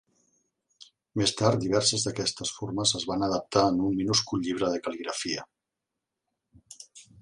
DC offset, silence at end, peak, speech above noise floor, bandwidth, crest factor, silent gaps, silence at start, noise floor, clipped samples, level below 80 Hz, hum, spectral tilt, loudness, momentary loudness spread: under 0.1%; 0.2 s; -6 dBFS; 59 dB; 11.5 kHz; 22 dB; none; 1.15 s; -86 dBFS; under 0.1%; -58 dBFS; none; -4 dB/octave; -27 LUFS; 11 LU